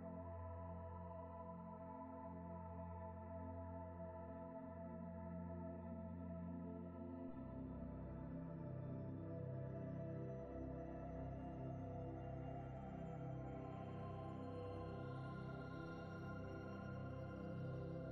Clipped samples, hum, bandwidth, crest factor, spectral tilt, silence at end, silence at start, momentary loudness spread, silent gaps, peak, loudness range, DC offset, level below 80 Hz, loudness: under 0.1%; none; 6.4 kHz; 12 dB; -10 dB/octave; 0 s; 0 s; 4 LU; none; -38 dBFS; 3 LU; under 0.1%; -64 dBFS; -52 LUFS